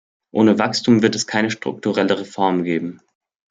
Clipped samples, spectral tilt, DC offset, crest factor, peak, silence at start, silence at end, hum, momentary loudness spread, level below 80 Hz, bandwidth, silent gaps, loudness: under 0.1%; -5 dB/octave; under 0.1%; 18 dB; -2 dBFS; 0.35 s; 0.55 s; none; 8 LU; -62 dBFS; 9.4 kHz; none; -19 LUFS